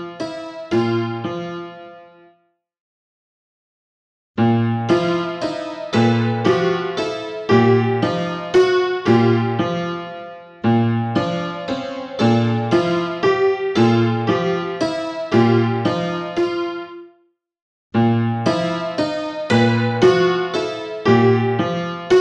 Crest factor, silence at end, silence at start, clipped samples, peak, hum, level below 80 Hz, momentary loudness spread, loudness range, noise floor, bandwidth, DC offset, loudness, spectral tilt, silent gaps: 18 dB; 0 s; 0 s; under 0.1%; -2 dBFS; none; -58 dBFS; 11 LU; 8 LU; -62 dBFS; 9 kHz; under 0.1%; -19 LUFS; -7 dB/octave; 2.80-4.34 s, 17.62-17.90 s